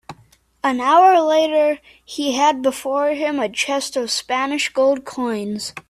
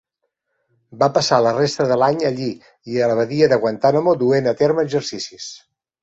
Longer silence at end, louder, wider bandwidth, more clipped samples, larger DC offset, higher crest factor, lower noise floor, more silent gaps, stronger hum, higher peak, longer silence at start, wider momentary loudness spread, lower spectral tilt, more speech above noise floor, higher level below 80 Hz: second, 0.1 s vs 0.45 s; about the same, -18 LUFS vs -18 LUFS; first, 15 kHz vs 8.2 kHz; neither; neither; about the same, 16 dB vs 18 dB; second, -54 dBFS vs -75 dBFS; neither; neither; about the same, -2 dBFS vs -2 dBFS; second, 0.1 s vs 0.9 s; about the same, 11 LU vs 12 LU; second, -2.5 dB/octave vs -5.5 dB/octave; second, 36 dB vs 57 dB; about the same, -62 dBFS vs -60 dBFS